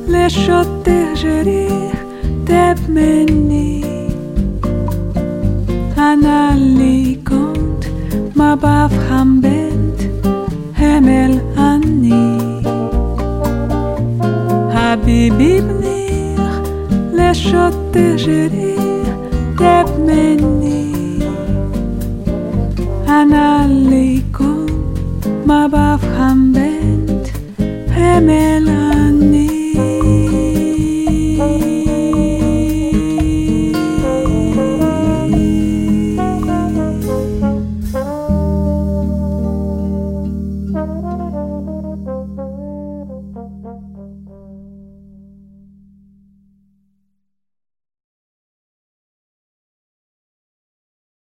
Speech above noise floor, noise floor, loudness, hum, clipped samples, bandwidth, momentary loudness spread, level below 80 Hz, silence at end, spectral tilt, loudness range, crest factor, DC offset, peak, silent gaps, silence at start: 62 dB; -73 dBFS; -14 LUFS; none; under 0.1%; 16.5 kHz; 10 LU; -24 dBFS; 6.5 s; -7 dB/octave; 7 LU; 14 dB; under 0.1%; 0 dBFS; none; 0 s